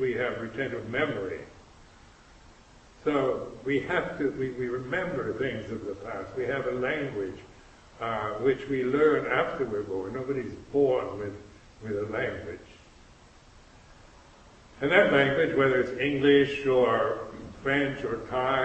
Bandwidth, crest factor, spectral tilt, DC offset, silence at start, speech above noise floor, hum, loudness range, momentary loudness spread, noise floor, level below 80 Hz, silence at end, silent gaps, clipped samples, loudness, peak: 8.4 kHz; 22 dB; -6.5 dB/octave; under 0.1%; 0 s; 27 dB; none; 9 LU; 14 LU; -54 dBFS; -56 dBFS; 0 s; none; under 0.1%; -28 LUFS; -6 dBFS